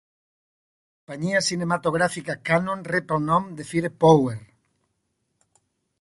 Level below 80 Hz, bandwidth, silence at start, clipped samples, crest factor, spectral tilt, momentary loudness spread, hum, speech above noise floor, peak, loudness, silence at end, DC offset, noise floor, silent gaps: -58 dBFS; 11.5 kHz; 1.1 s; under 0.1%; 22 dB; -5.5 dB/octave; 12 LU; none; 52 dB; -2 dBFS; -23 LUFS; 1.55 s; under 0.1%; -75 dBFS; none